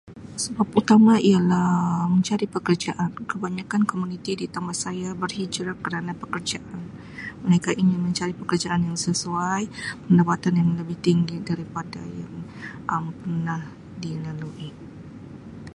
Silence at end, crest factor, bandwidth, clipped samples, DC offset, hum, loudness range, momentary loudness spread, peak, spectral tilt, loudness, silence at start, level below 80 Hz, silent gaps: 0 s; 20 dB; 11.5 kHz; under 0.1%; under 0.1%; none; 10 LU; 17 LU; -4 dBFS; -5.5 dB/octave; -24 LUFS; 0.05 s; -56 dBFS; none